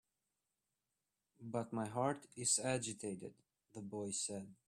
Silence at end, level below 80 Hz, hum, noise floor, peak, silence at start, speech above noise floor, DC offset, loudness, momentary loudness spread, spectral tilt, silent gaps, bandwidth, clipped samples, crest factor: 0.15 s; -80 dBFS; none; under -90 dBFS; -22 dBFS; 1.4 s; over 48 dB; under 0.1%; -40 LUFS; 18 LU; -3.5 dB/octave; none; 13.5 kHz; under 0.1%; 22 dB